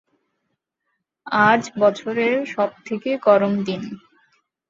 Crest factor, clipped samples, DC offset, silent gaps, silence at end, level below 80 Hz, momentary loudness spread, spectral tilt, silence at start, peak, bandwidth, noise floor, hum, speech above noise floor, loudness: 18 dB; under 0.1%; under 0.1%; none; 0.7 s; -66 dBFS; 12 LU; -5.5 dB/octave; 1.25 s; -2 dBFS; 7.6 kHz; -76 dBFS; none; 56 dB; -20 LUFS